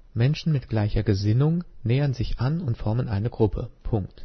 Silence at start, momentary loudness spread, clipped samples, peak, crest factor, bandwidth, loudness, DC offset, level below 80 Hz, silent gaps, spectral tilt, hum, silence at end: 0.15 s; 6 LU; under 0.1%; -8 dBFS; 16 dB; 6.4 kHz; -25 LUFS; under 0.1%; -36 dBFS; none; -8.5 dB/octave; none; 0 s